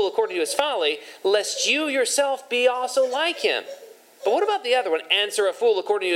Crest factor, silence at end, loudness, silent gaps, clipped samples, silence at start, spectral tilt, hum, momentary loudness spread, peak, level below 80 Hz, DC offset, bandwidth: 18 dB; 0 s; -22 LUFS; none; under 0.1%; 0 s; 0 dB/octave; none; 4 LU; -6 dBFS; under -90 dBFS; under 0.1%; 16.5 kHz